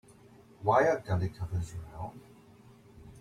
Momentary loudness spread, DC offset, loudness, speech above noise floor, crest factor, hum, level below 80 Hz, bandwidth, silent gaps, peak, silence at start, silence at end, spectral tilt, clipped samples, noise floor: 17 LU; under 0.1%; -31 LUFS; 27 dB; 22 dB; none; -56 dBFS; 12.5 kHz; none; -12 dBFS; 0.6 s; 0 s; -7 dB/octave; under 0.1%; -57 dBFS